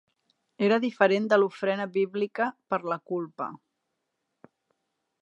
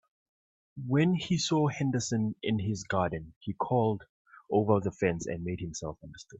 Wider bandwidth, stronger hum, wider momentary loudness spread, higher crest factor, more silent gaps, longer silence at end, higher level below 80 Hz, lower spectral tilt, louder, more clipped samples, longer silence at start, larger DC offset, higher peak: about the same, 8 kHz vs 8.4 kHz; neither; about the same, 11 LU vs 12 LU; about the same, 22 dB vs 20 dB; second, none vs 3.36-3.41 s, 4.09-4.25 s; first, 1.65 s vs 0.05 s; second, -82 dBFS vs -60 dBFS; about the same, -6.5 dB/octave vs -6 dB/octave; first, -27 LUFS vs -30 LUFS; neither; second, 0.6 s vs 0.75 s; neither; first, -6 dBFS vs -10 dBFS